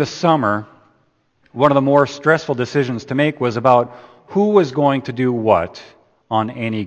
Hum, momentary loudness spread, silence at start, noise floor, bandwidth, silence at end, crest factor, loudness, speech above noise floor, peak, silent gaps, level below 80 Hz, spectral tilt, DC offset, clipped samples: none; 8 LU; 0 s; -61 dBFS; 8.4 kHz; 0 s; 18 dB; -17 LUFS; 44 dB; 0 dBFS; none; -56 dBFS; -7 dB/octave; under 0.1%; under 0.1%